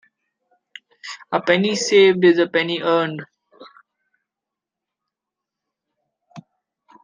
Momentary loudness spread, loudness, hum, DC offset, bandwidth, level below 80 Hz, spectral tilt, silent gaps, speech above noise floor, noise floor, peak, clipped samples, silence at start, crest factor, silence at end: 21 LU; -17 LUFS; none; under 0.1%; 9.8 kHz; -72 dBFS; -4.5 dB/octave; none; 69 dB; -85 dBFS; -2 dBFS; under 0.1%; 1.05 s; 20 dB; 0.65 s